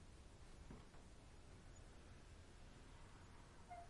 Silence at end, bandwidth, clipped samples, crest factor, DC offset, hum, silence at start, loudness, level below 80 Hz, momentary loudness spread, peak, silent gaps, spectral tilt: 0 s; 11 kHz; under 0.1%; 14 dB; under 0.1%; none; 0 s; -64 LUFS; -64 dBFS; 3 LU; -46 dBFS; none; -5 dB/octave